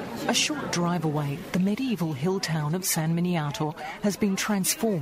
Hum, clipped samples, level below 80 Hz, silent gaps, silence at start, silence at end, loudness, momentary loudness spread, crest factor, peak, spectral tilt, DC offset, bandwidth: none; under 0.1%; -58 dBFS; none; 0 s; 0 s; -26 LUFS; 5 LU; 18 dB; -10 dBFS; -4.5 dB/octave; under 0.1%; 16 kHz